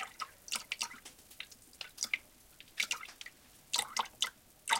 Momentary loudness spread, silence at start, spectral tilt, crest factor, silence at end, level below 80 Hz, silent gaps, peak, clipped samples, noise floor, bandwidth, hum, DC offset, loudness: 16 LU; 0 s; 2 dB/octave; 28 dB; 0 s; -72 dBFS; none; -14 dBFS; under 0.1%; -59 dBFS; 17 kHz; none; under 0.1%; -38 LUFS